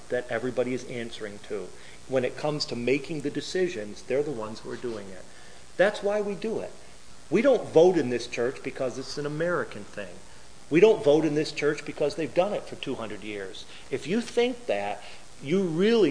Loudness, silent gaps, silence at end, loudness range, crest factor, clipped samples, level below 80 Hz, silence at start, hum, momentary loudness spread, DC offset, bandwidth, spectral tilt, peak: -27 LUFS; none; 0 s; 5 LU; 20 dB; under 0.1%; -60 dBFS; 0 s; none; 18 LU; 0.8%; 10.5 kHz; -5.5 dB/octave; -6 dBFS